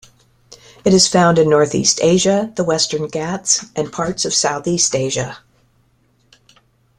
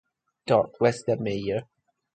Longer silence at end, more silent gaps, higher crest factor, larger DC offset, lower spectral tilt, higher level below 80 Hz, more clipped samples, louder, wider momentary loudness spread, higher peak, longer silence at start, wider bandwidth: first, 1.6 s vs 0.5 s; neither; about the same, 18 dB vs 20 dB; neither; second, -3.5 dB/octave vs -6.5 dB/octave; first, -52 dBFS vs -58 dBFS; neither; first, -15 LUFS vs -26 LUFS; about the same, 10 LU vs 9 LU; first, 0 dBFS vs -6 dBFS; about the same, 0.5 s vs 0.45 s; first, 12.5 kHz vs 9.2 kHz